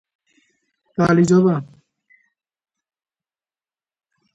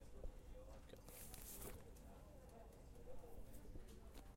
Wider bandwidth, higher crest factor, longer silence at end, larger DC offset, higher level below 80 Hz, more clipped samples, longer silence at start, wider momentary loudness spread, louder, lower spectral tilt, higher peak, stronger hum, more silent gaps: second, 8.2 kHz vs 16.5 kHz; about the same, 18 dB vs 20 dB; first, 2.7 s vs 0 s; neither; about the same, -58 dBFS vs -60 dBFS; neither; first, 1 s vs 0 s; first, 13 LU vs 8 LU; first, -17 LUFS vs -60 LUFS; first, -7.5 dB/octave vs -4.5 dB/octave; first, -4 dBFS vs -36 dBFS; neither; neither